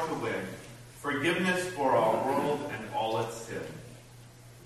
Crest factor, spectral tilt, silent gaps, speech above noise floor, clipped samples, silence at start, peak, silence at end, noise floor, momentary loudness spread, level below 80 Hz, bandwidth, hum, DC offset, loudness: 18 dB; -5 dB/octave; none; 21 dB; under 0.1%; 0 s; -14 dBFS; 0 s; -51 dBFS; 20 LU; -62 dBFS; 13 kHz; none; under 0.1%; -30 LUFS